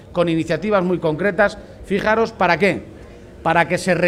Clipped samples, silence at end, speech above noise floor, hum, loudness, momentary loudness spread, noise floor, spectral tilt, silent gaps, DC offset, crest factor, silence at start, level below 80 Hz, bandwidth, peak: under 0.1%; 0 s; 21 dB; none; -19 LUFS; 8 LU; -39 dBFS; -6 dB/octave; none; under 0.1%; 18 dB; 0 s; -44 dBFS; 13.5 kHz; 0 dBFS